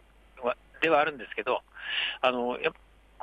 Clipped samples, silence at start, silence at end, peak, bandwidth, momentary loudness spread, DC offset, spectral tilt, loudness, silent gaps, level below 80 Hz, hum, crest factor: under 0.1%; 0.35 s; 0.5 s; -10 dBFS; 9 kHz; 9 LU; under 0.1%; -5 dB/octave; -29 LUFS; none; -62 dBFS; none; 20 dB